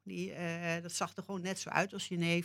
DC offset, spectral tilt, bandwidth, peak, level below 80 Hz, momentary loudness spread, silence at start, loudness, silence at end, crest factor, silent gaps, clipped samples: under 0.1%; -4.5 dB/octave; 16 kHz; -14 dBFS; -84 dBFS; 5 LU; 0.05 s; -37 LUFS; 0 s; 24 dB; none; under 0.1%